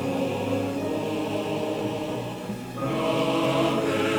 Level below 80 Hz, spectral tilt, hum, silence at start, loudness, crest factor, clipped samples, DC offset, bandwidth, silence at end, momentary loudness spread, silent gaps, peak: -56 dBFS; -5.5 dB/octave; none; 0 s; -27 LUFS; 14 dB; under 0.1%; under 0.1%; over 20 kHz; 0 s; 8 LU; none; -12 dBFS